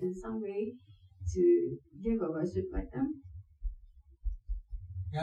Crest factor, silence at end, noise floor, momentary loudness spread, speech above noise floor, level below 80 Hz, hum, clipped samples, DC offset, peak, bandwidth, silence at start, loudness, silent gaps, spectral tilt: 16 dB; 0 s; -56 dBFS; 18 LU; 24 dB; -44 dBFS; none; under 0.1%; under 0.1%; -18 dBFS; 7.8 kHz; 0 s; -35 LUFS; none; -8.5 dB/octave